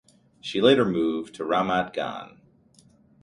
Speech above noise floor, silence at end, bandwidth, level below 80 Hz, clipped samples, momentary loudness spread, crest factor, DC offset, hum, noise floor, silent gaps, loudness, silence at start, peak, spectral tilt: 34 dB; 0.95 s; 11 kHz; -60 dBFS; under 0.1%; 14 LU; 22 dB; under 0.1%; none; -58 dBFS; none; -24 LUFS; 0.45 s; -4 dBFS; -6 dB/octave